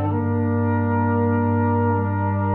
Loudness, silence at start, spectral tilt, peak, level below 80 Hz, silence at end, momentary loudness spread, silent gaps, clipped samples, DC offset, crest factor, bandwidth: -21 LUFS; 0 s; -12.5 dB/octave; -10 dBFS; -56 dBFS; 0 s; 2 LU; none; under 0.1%; under 0.1%; 10 dB; 3 kHz